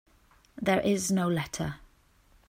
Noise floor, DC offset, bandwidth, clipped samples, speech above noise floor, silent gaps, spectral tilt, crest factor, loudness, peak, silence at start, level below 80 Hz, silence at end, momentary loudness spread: -62 dBFS; under 0.1%; 16 kHz; under 0.1%; 34 dB; none; -5 dB/octave; 18 dB; -29 LUFS; -12 dBFS; 0.55 s; -58 dBFS; 0.7 s; 10 LU